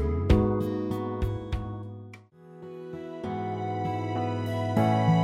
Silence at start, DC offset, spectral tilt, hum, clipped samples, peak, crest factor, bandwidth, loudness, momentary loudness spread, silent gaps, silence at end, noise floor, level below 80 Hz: 0 s; under 0.1%; -8.5 dB/octave; none; under 0.1%; -8 dBFS; 20 dB; 14.5 kHz; -29 LUFS; 18 LU; none; 0 s; -49 dBFS; -38 dBFS